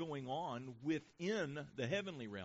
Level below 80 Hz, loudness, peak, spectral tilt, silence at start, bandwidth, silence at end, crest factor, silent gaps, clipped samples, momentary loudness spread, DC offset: -78 dBFS; -43 LUFS; -26 dBFS; -4.5 dB/octave; 0 s; 7.6 kHz; 0 s; 16 dB; none; under 0.1%; 5 LU; under 0.1%